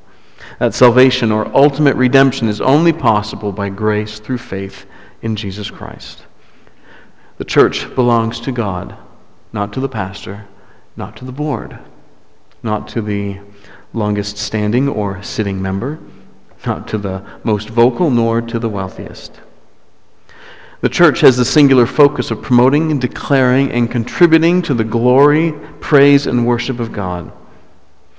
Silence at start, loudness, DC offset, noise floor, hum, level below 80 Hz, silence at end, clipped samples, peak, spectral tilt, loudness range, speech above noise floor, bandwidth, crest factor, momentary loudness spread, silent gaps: 0.4 s; -15 LUFS; 1%; -53 dBFS; none; -42 dBFS; 0.85 s; under 0.1%; 0 dBFS; -6.5 dB/octave; 11 LU; 39 dB; 8 kHz; 16 dB; 17 LU; none